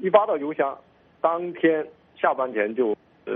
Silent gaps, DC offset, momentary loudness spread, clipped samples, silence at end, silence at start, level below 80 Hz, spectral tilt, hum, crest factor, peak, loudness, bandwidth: none; under 0.1%; 8 LU; under 0.1%; 0 s; 0 s; -72 dBFS; -4 dB/octave; none; 22 dB; -2 dBFS; -24 LUFS; 3.8 kHz